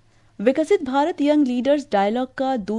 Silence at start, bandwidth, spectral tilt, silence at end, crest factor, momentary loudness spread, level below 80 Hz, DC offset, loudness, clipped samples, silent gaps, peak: 0.4 s; 11 kHz; -6 dB/octave; 0 s; 16 dB; 5 LU; -58 dBFS; under 0.1%; -20 LUFS; under 0.1%; none; -4 dBFS